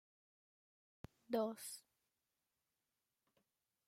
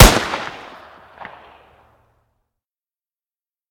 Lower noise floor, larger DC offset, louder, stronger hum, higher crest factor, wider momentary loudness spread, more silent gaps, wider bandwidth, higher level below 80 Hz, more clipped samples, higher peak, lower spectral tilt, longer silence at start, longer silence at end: about the same, under -90 dBFS vs under -90 dBFS; neither; second, -44 LUFS vs -17 LUFS; neither; about the same, 24 dB vs 20 dB; about the same, 21 LU vs 23 LU; neither; about the same, 16 kHz vs 17.5 kHz; second, -82 dBFS vs -24 dBFS; second, under 0.1% vs 0.4%; second, -28 dBFS vs 0 dBFS; about the same, -4.5 dB/octave vs -4 dB/octave; first, 1.3 s vs 0 s; second, 2.1 s vs 3.2 s